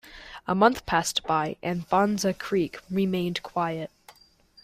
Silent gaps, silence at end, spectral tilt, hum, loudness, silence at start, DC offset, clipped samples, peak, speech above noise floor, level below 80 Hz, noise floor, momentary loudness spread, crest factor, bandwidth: none; 0.75 s; -4.5 dB/octave; none; -26 LUFS; 0.05 s; under 0.1%; under 0.1%; -6 dBFS; 32 dB; -56 dBFS; -58 dBFS; 11 LU; 22 dB; 16 kHz